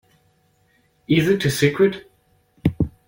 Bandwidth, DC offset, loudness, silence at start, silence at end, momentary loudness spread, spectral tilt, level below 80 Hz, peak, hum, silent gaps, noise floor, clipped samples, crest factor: 16.5 kHz; under 0.1%; -20 LUFS; 1.1 s; 0.2 s; 8 LU; -6 dB/octave; -44 dBFS; -4 dBFS; none; none; -62 dBFS; under 0.1%; 18 dB